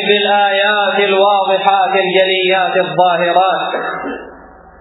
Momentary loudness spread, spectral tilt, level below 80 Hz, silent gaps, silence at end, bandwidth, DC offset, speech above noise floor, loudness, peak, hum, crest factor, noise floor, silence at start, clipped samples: 8 LU; -7 dB/octave; -56 dBFS; none; 0.4 s; 4.1 kHz; under 0.1%; 25 dB; -12 LUFS; 0 dBFS; none; 14 dB; -38 dBFS; 0 s; under 0.1%